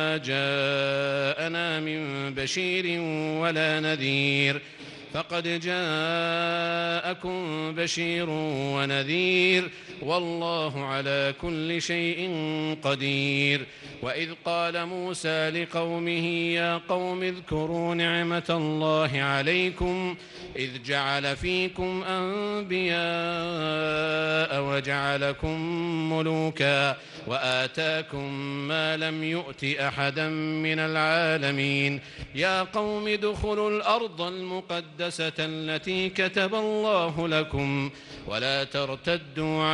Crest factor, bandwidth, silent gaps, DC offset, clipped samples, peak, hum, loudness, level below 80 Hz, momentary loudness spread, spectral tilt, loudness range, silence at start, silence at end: 18 dB; 11.5 kHz; none; under 0.1%; under 0.1%; -10 dBFS; none; -27 LUFS; -52 dBFS; 7 LU; -5 dB/octave; 2 LU; 0 s; 0 s